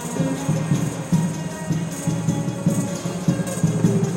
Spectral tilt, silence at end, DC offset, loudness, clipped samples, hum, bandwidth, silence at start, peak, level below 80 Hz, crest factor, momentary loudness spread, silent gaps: -6.5 dB/octave; 0 s; under 0.1%; -23 LUFS; under 0.1%; none; 16 kHz; 0 s; -6 dBFS; -50 dBFS; 16 dB; 6 LU; none